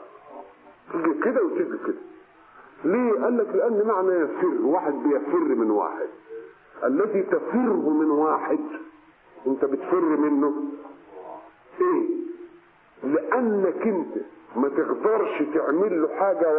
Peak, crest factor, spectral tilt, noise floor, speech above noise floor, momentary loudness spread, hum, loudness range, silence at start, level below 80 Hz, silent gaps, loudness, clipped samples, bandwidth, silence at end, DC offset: -8 dBFS; 18 dB; -11.5 dB/octave; -53 dBFS; 30 dB; 18 LU; none; 4 LU; 0 s; -74 dBFS; none; -24 LUFS; under 0.1%; 3.4 kHz; 0 s; under 0.1%